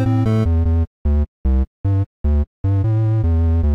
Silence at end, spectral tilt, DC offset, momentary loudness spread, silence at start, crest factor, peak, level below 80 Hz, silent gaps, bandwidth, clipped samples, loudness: 0 s; -10 dB/octave; 0.3%; 4 LU; 0 s; 8 dB; -8 dBFS; -20 dBFS; 0.87-1.05 s, 1.28-1.44 s, 1.67-1.84 s, 2.06-2.24 s, 2.47-2.64 s; 4.9 kHz; under 0.1%; -19 LUFS